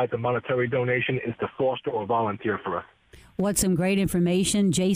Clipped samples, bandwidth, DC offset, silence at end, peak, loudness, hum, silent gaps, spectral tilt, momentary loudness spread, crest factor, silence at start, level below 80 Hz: under 0.1%; 15.5 kHz; under 0.1%; 0 s; -10 dBFS; -25 LUFS; none; none; -5 dB/octave; 7 LU; 16 dB; 0 s; -50 dBFS